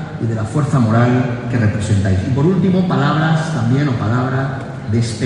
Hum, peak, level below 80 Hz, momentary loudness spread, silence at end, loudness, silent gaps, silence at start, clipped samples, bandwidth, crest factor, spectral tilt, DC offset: none; -2 dBFS; -36 dBFS; 7 LU; 0 s; -16 LUFS; none; 0 s; under 0.1%; 10.5 kHz; 14 dB; -7.5 dB/octave; under 0.1%